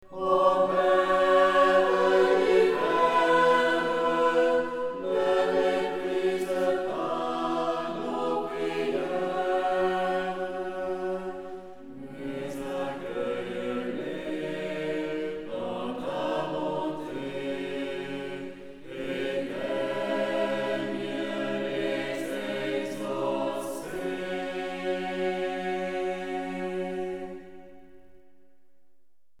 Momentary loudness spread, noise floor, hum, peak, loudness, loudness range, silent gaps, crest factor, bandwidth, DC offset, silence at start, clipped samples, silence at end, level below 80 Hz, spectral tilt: 12 LU; -72 dBFS; none; -10 dBFS; -28 LUFS; 11 LU; none; 18 dB; 15 kHz; 0.4%; 0.1 s; under 0.1%; 1.45 s; -58 dBFS; -5 dB/octave